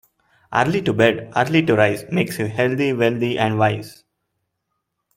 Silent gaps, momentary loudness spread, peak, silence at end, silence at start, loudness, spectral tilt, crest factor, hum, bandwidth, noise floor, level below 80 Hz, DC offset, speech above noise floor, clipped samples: none; 6 LU; -2 dBFS; 1.25 s; 0.5 s; -19 LUFS; -6.5 dB/octave; 18 dB; none; 16.5 kHz; -76 dBFS; -56 dBFS; under 0.1%; 57 dB; under 0.1%